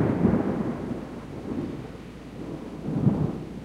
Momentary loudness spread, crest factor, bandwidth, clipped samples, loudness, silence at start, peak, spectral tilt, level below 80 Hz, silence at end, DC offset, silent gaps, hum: 15 LU; 18 dB; 12 kHz; under 0.1%; -29 LUFS; 0 s; -8 dBFS; -9 dB/octave; -46 dBFS; 0 s; under 0.1%; none; none